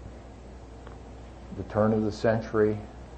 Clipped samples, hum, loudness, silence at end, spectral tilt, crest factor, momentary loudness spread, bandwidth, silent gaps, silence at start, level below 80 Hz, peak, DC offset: under 0.1%; none; -27 LUFS; 0 s; -8 dB/octave; 20 dB; 21 LU; 8.6 kHz; none; 0 s; -46 dBFS; -10 dBFS; under 0.1%